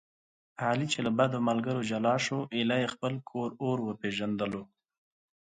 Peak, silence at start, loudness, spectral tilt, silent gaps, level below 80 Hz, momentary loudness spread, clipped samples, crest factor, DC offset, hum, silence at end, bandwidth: -14 dBFS; 0.6 s; -31 LUFS; -5.5 dB/octave; none; -70 dBFS; 8 LU; under 0.1%; 18 dB; under 0.1%; none; 0.9 s; 9.4 kHz